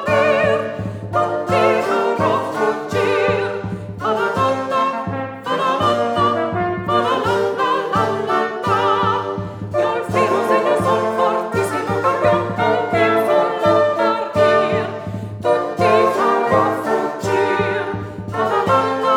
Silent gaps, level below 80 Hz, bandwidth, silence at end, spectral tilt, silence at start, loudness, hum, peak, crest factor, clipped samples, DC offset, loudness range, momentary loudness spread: none; -52 dBFS; 18 kHz; 0 s; -6 dB/octave; 0 s; -18 LUFS; none; -2 dBFS; 16 dB; under 0.1%; under 0.1%; 2 LU; 8 LU